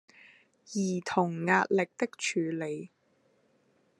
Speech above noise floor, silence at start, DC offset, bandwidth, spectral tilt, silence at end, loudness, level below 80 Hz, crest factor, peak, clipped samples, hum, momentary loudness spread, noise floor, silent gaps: 40 dB; 0.7 s; under 0.1%; 11.5 kHz; -5 dB/octave; 1.1 s; -30 LUFS; -82 dBFS; 24 dB; -10 dBFS; under 0.1%; none; 12 LU; -69 dBFS; none